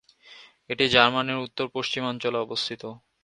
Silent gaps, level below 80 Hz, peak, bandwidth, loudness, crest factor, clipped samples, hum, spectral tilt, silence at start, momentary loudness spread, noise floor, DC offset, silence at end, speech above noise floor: none; -62 dBFS; 0 dBFS; 10.5 kHz; -24 LUFS; 26 dB; under 0.1%; none; -4 dB/octave; 0.25 s; 15 LU; -51 dBFS; under 0.1%; 0.25 s; 26 dB